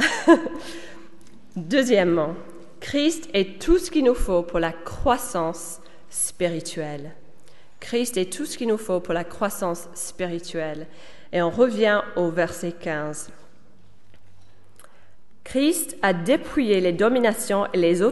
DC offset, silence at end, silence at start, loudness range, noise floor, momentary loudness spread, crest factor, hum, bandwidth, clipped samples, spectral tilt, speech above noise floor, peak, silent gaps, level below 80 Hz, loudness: 1%; 0 s; 0 s; 6 LU; -55 dBFS; 17 LU; 22 dB; none; 12 kHz; under 0.1%; -4.5 dB/octave; 33 dB; -2 dBFS; none; -40 dBFS; -23 LUFS